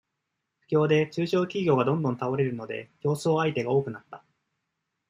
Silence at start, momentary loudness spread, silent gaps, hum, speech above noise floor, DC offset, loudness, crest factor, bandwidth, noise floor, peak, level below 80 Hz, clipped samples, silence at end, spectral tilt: 0.7 s; 10 LU; none; none; 56 dB; under 0.1%; -26 LUFS; 18 dB; 14 kHz; -82 dBFS; -10 dBFS; -70 dBFS; under 0.1%; 0.9 s; -7 dB/octave